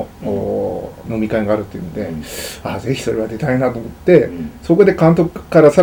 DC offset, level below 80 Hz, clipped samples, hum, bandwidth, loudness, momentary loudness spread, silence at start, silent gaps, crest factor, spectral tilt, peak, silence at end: under 0.1%; -40 dBFS; under 0.1%; none; over 20 kHz; -16 LUFS; 14 LU; 0 s; none; 14 dB; -7 dB/octave; 0 dBFS; 0 s